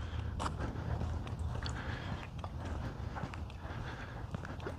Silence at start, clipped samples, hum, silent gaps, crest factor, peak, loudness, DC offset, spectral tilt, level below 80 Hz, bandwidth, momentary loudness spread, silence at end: 0 s; under 0.1%; none; none; 18 dB; -22 dBFS; -42 LUFS; under 0.1%; -6 dB/octave; -46 dBFS; 11.5 kHz; 5 LU; 0 s